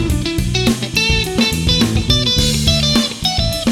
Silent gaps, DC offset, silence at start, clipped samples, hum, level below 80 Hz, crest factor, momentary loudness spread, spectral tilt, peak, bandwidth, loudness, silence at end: none; under 0.1%; 0 s; under 0.1%; none; -24 dBFS; 14 dB; 4 LU; -4 dB/octave; 0 dBFS; 18.5 kHz; -14 LUFS; 0 s